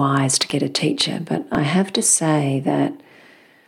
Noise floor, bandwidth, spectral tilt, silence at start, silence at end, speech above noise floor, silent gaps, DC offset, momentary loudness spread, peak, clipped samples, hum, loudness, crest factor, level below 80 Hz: -49 dBFS; 17 kHz; -4 dB/octave; 0 s; 0.7 s; 30 dB; none; under 0.1%; 7 LU; -4 dBFS; under 0.1%; none; -19 LUFS; 16 dB; -58 dBFS